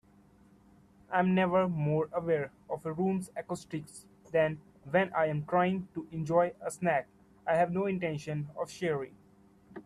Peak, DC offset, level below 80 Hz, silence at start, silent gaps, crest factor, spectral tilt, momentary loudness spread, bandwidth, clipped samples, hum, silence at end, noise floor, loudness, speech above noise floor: -14 dBFS; under 0.1%; -68 dBFS; 1.1 s; none; 20 dB; -7 dB/octave; 12 LU; 12.5 kHz; under 0.1%; none; 0.05 s; -61 dBFS; -32 LUFS; 30 dB